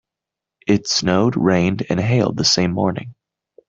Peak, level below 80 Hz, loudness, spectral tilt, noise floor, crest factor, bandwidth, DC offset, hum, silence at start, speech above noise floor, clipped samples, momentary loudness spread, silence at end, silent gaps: -2 dBFS; -52 dBFS; -17 LUFS; -5 dB/octave; -85 dBFS; 18 dB; 7.8 kHz; under 0.1%; none; 0.65 s; 68 dB; under 0.1%; 6 LU; 0.55 s; none